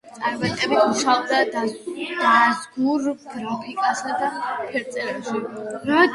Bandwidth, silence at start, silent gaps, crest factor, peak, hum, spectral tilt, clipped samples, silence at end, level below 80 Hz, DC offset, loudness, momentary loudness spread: 11.5 kHz; 0.05 s; none; 20 dB; -2 dBFS; none; -3.5 dB/octave; under 0.1%; 0 s; -64 dBFS; under 0.1%; -22 LUFS; 11 LU